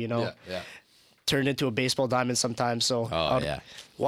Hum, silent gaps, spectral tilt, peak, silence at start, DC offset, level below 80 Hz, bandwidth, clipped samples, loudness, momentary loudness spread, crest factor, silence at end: none; none; -4 dB/octave; -10 dBFS; 0 s; under 0.1%; -56 dBFS; 16.5 kHz; under 0.1%; -28 LUFS; 12 LU; 18 dB; 0 s